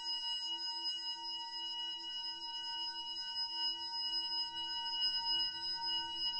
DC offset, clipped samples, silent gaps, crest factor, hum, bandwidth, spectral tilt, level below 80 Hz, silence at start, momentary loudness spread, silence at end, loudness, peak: under 0.1%; under 0.1%; none; 14 dB; none; 11 kHz; 0.5 dB/octave; -76 dBFS; 0 s; 6 LU; 0 s; -37 LUFS; -26 dBFS